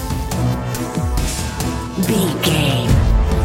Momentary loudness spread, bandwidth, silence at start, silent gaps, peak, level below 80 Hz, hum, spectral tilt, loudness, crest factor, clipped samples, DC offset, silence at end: 7 LU; 17 kHz; 0 s; none; -2 dBFS; -22 dBFS; none; -5 dB/octave; -18 LUFS; 14 dB; under 0.1%; under 0.1%; 0 s